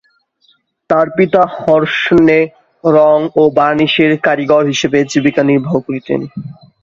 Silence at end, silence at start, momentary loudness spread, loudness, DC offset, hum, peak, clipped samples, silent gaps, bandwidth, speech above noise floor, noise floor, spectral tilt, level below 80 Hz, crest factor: 0.3 s; 0.9 s; 9 LU; -12 LUFS; under 0.1%; none; 0 dBFS; under 0.1%; none; 7.6 kHz; 44 dB; -55 dBFS; -5.5 dB/octave; -50 dBFS; 12 dB